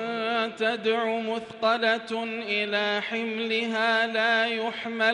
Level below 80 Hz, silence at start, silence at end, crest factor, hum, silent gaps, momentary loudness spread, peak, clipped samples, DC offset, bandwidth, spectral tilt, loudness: -76 dBFS; 0 s; 0 s; 16 dB; none; none; 7 LU; -10 dBFS; under 0.1%; under 0.1%; 10.5 kHz; -4 dB/octave; -26 LUFS